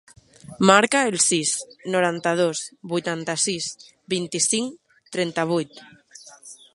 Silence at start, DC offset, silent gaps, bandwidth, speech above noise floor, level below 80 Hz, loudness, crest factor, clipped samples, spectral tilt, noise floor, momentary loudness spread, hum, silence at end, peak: 0.5 s; under 0.1%; none; 11.5 kHz; 25 dB; -66 dBFS; -22 LUFS; 24 dB; under 0.1%; -3 dB/octave; -47 dBFS; 16 LU; none; 0.2 s; 0 dBFS